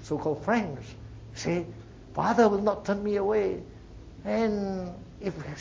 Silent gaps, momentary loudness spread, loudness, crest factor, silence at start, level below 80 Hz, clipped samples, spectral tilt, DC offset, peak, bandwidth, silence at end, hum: none; 21 LU; -28 LUFS; 20 dB; 0 s; -50 dBFS; under 0.1%; -6.5 dB/octave; under 0.1%; -10 dBFS; 7.8 kHz; 0 s; none